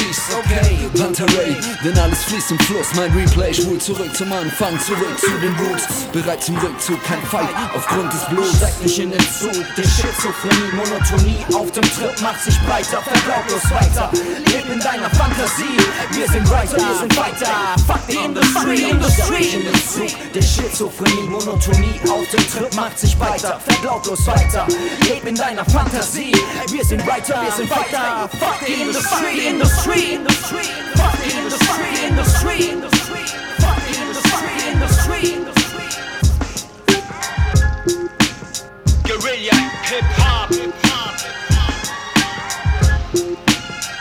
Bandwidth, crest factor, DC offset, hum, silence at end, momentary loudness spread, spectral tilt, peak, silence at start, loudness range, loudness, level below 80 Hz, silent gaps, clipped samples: over 20 kHz; 16 dB; under 0.1%; none; 0 s; 5 LU; -4 dB/octave; 0 dBFS; 0 s; 2 LU; -17 LUFS; -22 dBFS; none; under 0.1%